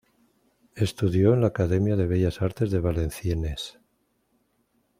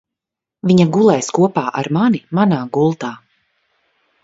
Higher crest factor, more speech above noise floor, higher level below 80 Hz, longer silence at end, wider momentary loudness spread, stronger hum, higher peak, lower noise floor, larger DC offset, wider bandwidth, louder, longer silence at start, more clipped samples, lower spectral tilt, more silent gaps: about the same, 18 dB vs 16 dB; second, 47 dB vs 70 dB; first, -44 dBFS vs -58 dBFS; first, 1.3 s vs 1.1 s; about the same, 9 LU vs 9 LU; neither; second, -6 dBFS vs 0 dBFS; second, -71 dBFS vs -85 dBFS; neither; first, 15.5 kHz vs 8 kHz; second, -25 LUFS vs -15 LUFS; about the same, 0.75 s vs 0.65 s; neither; about the same, -7.5 dB/octave vs -6.5 dB/octave; neither